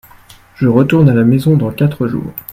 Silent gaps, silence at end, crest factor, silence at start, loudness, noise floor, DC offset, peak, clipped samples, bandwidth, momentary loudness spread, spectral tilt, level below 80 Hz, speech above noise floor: none; 0 s; 12 dB; 0.6 s; -12 LUFS; -41 dBFS; under 0.1%; 0 dBFS; under 0.1%; 16 kHz; 9 LU; -9 dB/octave; -44 dBFS; 30 dB